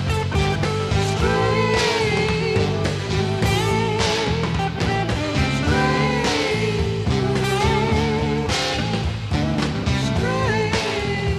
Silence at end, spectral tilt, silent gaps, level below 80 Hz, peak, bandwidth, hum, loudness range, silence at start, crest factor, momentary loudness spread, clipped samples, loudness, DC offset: 0 s; -5.5 dB/octave; none; -32 dBFS; -6 dBFS; 14 kHz; none; 1 LU; 0 s; 14 dB; 4 LU; under 0.1%; -20 LUFS; under 0.1%